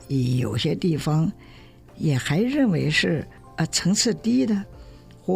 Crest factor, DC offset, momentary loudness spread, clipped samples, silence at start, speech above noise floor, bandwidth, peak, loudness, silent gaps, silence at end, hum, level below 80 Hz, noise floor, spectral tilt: 16 dB; under 0.1%; 8 LU; under 0.1%; 0 s; 22 dB; 16 kHz; -8 dBFS; -23 LUFS; none; 0 s; none; -50 dBFS; -45 dBFS; -5 dB/octave